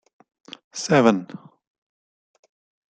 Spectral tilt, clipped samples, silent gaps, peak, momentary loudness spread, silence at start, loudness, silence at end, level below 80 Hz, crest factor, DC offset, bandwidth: -5 dB/octave; under 0.1%; none; -4 dBFS; 26 LU; 0.75 s; -20 LUFS; 1.5 s; -68 dBFS; 22 dB; under 0.1%; 9.4 kHz